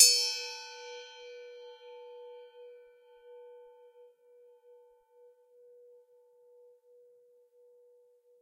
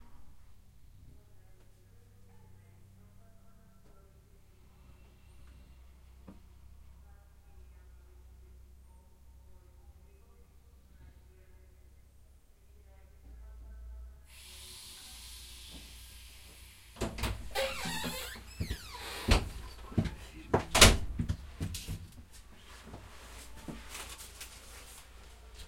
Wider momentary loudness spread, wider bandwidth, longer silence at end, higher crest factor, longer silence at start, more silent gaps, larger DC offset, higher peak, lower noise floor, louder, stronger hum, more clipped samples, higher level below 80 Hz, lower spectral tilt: about the same, 25 LU vs 25 LU; about the same, 15.5 kHz vs 16.5 kHz; first, 6 s vs 0 s; about the same, 32 dB vs 34 dB; about the same, 0 s vs 0 s; neither; neither; about the same, -6 dBFS vs -4 dBFS; first, -64 dBFS vs -59 dBFS; first, -30 LUFS vs -33 LUFS; neither; neither; second, -84 dBFS vs -44 dBFS; second, 6.5 dB/octave vs -3 dB/octave